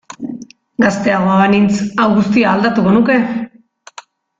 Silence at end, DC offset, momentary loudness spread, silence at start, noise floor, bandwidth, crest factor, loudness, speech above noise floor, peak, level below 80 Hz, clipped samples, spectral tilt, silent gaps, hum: 0.95 s; under 0.1%; 16 LU; 0.1 s; -39 dBFS; 7.8 kHz; 12 dB; -13 LUFS; 27 dB; -2 dBFS; -50 dBFS; under 0.1%; -6.5 dB/octave; none; none